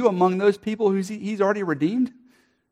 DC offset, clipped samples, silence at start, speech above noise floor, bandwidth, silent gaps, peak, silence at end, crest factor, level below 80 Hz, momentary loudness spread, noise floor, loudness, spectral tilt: under 0.1%; under 0.1%; 0 s; 38 dB; 12.5 kHz; none; -6 dBFS; 0.6 s; 18 dB; -70 dBFS; 7 LU; -59 dBFS; -23 LUFS; -7 dB/octave